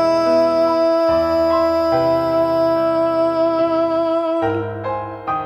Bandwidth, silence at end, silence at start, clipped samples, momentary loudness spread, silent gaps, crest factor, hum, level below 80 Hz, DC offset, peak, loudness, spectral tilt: 13 kHz; 0 s; 0 s; under 0.1%; 8 LU; none; 10 dB; none; -48 dBFS; under 0.1%; -6 dBFS; -17 LUFS; -7 dB/octave